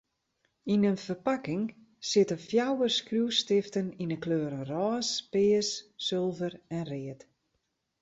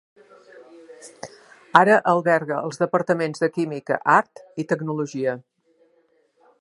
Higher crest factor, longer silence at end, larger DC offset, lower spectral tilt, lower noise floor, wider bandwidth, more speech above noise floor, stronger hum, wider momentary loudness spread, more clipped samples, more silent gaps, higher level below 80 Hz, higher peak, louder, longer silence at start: about the same, 18 dB vs 22 dB; second, 0.85 s vs 1.2 s; neither; second, -4.5 dB/octave vs -6 dB/octave; first, -79 dBFS vs -63 dBFS; second, 8 kHz vs 11.5 kHz; first, 50 dB vs 42 dB; neither; second, 11 LU vs 19 LU; neither; neither; about the same, -70 dBFS vs -74 dBFS; second, -12 dBFS vs 0 dBFS; second, -30 LUFS vs -21 LUFS; about the same, 0.65 s vs 0.55 s